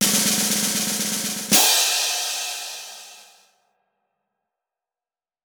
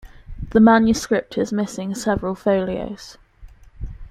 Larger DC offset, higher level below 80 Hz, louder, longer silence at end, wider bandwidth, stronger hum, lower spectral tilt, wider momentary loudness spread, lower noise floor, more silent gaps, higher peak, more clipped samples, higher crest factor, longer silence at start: neither; second, -68 dBFS vs -38 dBFS; about the same, -19 LUFS vs -19 LUFS; first, 2.25 s vs 0 s; first, over 20 kHz vs 13 kHz; neither; second, -0.5 dB/octave vs -5.5 dB/octave; second, 17 LU vs 24 LU; first, under -90 dBFS vs -44 dBFS; neither; about the same, -2 dBFS vs -2 dBFS; neither; about the same, 22 dB vs 18 dB; about the same, 0 s vs 0.05 s